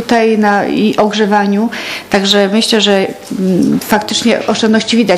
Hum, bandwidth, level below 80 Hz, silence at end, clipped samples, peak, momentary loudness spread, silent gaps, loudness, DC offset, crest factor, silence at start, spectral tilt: none; 15.5 kHz; -50 dBFS; 0 s; 0.2%; 0 dBFS; 5 LU; none; -11 LUFS; under 0.1%; 12 dB; 0 s; -4.5 dB/octave